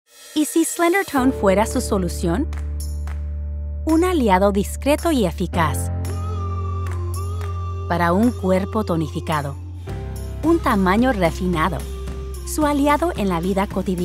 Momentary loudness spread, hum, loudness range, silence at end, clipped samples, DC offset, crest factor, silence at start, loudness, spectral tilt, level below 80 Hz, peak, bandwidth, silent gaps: 11 LU; none; 2 LU; 0 s; under 0.1%; under 0.1%; 18 dB; 0.2 s; -21 LUFS; -6 dB/octave; -30 dBFS; -2 dBFS; 16 kHz; none